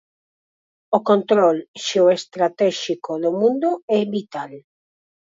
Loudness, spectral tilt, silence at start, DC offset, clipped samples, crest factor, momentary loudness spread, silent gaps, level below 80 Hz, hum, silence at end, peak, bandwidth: -19 LUFS; -5 dB/octave; 0.9 s; under 0.1%; under 0.1%; 20 dB; 9 LU; 1.68-1.74 s, 3.83-3.88 s; -74 dBFS; none; 0.8 s; -2 dBFS; 7.8 kHz